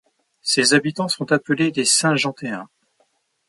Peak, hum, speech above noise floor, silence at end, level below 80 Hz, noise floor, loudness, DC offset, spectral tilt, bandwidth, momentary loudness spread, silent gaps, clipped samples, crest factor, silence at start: -2 dBFS; none; 46 dB; 0.85 s; -68 dBFS; -65 dBFS; -19 LUFS; under 0.1%; -3 dB/octave; 11.5 kHz; 14 LU; none; under 0.1%; 18 dB; 0.45 s